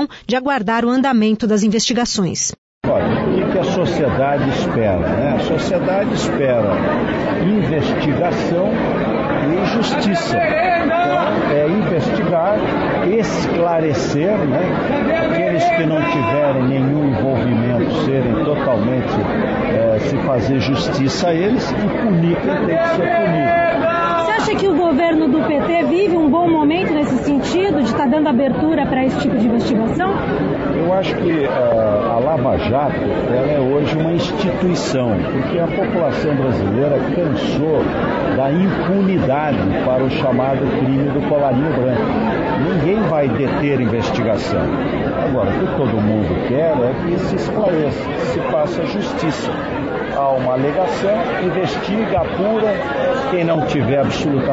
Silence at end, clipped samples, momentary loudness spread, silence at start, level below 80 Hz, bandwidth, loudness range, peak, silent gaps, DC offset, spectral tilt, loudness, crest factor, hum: 0 s; under 0.1%; 3 LU; 0 s; -40 dBFS; 8 kHz; 2 LU; -6 dBFS; 2.58-2.81 s; under 0.1%; -6 dB/octave; -17 LUFS; 10 dB; none